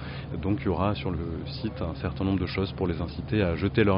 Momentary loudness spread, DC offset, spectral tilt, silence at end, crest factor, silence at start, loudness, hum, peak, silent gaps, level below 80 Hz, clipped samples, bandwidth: 7 LU; under 0.1%; -6 dB/octave; 0 s; 18 dB; 0 s; -29 LUFS; none; -10 dBFS; none; -42 dBFS; under 0.1%; 5.4 kHz